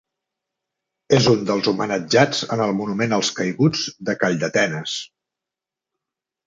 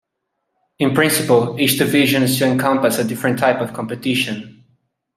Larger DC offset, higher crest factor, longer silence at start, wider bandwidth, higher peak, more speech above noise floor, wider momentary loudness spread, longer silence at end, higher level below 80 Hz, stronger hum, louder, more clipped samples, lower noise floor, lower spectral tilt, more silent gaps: neither; about the same, 20 dB vs 18 dB; first, 1.1 s vs 0.8 s; second, 9.4 kHz vs 16 kHz; about the same, -2 dBFS vs 0 dBFS; first, 68 dB vs 58 dB; about the same, 8 LU vs 8 LU; first, 1.4 s vs 0.65 s; about the same, -58 dBFS vs -60 dBFS; neither; second, -20 LUFS vs -17 LUFS; neither; first, -87 dBFS vs -75 dBFS; about the same, -4.5 dB/octave vs -4.5 dB/octave; neither